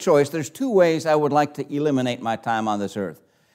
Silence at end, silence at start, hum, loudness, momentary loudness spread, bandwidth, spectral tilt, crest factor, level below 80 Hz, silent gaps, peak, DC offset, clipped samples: 0.4 s; 0 s; none; -22 LUFS; 8 LU; 16 kHz; -5.5 dB/octave; 16 dB; -74 dBFS; none; -4 dBFS; under 0.1%; under 0.1%